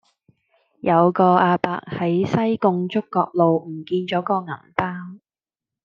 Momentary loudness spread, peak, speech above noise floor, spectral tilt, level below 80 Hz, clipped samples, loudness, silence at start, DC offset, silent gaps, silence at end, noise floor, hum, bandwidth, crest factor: 11 LU; -2 dBFS; over 70 dB; -8.5 dB/octave; -64 dBFS; under 0.1%; -20 LUFS; 0.85 s; under 0.1%; none; 0.7 s; under -90 dBFS; none; 6.8 kHz; 20 dB